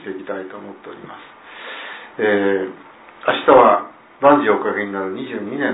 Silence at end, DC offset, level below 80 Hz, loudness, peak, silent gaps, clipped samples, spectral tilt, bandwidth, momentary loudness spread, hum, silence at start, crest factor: 0 s; under 0.1%; -58 dBFS; -17 LUFS; 0 dBFS; none; under 0.1%; -9 dB/octave; 4 kHz; 24 LU; none; 0 s; 18 dB